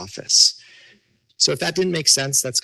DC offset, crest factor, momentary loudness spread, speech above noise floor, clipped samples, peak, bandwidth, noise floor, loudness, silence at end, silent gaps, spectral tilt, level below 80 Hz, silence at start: under 0.1%; 20 dB; 6 LU; 39 dB; under 0.1%; 0 dBFS; 13 kHz; -58 dBFS; -16 LUFS; 0.05 s; none; -1.5 dB/octave; -60 dBFS; 0 s